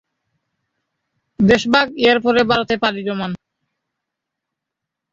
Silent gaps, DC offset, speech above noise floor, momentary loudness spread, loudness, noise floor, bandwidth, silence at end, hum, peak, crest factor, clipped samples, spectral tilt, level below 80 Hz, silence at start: none; under 0.1%; 66 dB; 11 LU; -16 LUFS; -82 dBFS; 7.8 kHz; 1.75 s; none; -2 dBFS; 18 dB; under 0.1%; -5.5 dB/octave; -50 dBFS; 1.4 s